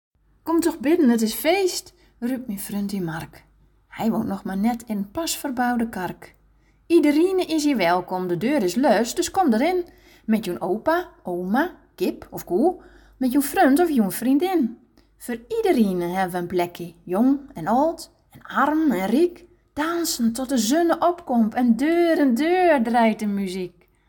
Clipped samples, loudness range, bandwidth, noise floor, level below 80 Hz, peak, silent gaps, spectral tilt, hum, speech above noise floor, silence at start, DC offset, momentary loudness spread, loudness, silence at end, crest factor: under 0.1%; 6 LU; 17.5 kHz; -58 dBFS; -54 dBFS; -6 dBFS; none; -5 dB/octave; none; 37 dB; 0.45 s; under 0.1%; 12 LU; -22 LUFS; 0.4 s; 16 dB